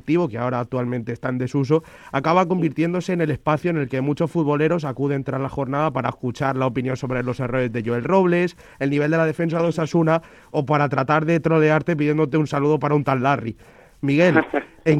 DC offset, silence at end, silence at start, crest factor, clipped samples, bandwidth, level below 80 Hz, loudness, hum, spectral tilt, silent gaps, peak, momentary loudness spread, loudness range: under 0.1%; 0 s; 0.05 s; 20 dB; under 0.1%; 11 kHz; -52 dBFS; -21 LUFS; none; -8 dB/octave; none; 0 dBFS; 8 LU; 3 LU